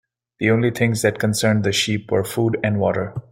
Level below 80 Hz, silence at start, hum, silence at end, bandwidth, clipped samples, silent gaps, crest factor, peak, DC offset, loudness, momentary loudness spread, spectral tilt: -54 dBFS; 0.4 s; none; 0.1 s; 16.5 kHz; under 0.1%; none; 18 dB; -2 dBFS; under 0.1%; -20 LUFS; 4 LU; -5 dB/octave